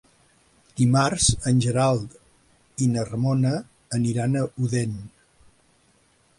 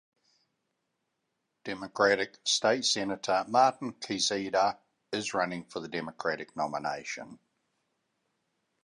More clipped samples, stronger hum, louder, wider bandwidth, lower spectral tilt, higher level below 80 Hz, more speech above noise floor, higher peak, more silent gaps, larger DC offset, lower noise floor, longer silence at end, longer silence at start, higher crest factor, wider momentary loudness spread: neither; neither; first, -23 LUFS vs -30 LUFS; about the same, 11.5 kHz vs 11 kHz; first, -5.5 dB/octave vs -2.5 dB/octave; first, -46 dBFS vs -72 dBFS; second, 40 dB vs 52 dB; first, -6 dBFS vs -12 dBFS; neither; neither; second, -62 dBFS vs -82 dBFS; second, 1.3 s vs 1.5 s; second, 0.75 s vs 1.65 s; about the same, 18 dB vs 22 dB; second, 11 LU vs 14 LU